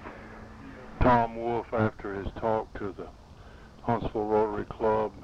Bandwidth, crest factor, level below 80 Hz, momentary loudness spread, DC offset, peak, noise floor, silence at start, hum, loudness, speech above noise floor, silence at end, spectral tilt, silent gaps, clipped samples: 8 kHz; 20 dB; -42 dBFS; 21 LU; under 0.1%; -10 dBFS; -49 dBFS; 0 s; none; -29 LUFS; 20 dB; 0 s; -8.5 dB/octave; none; under 0.1%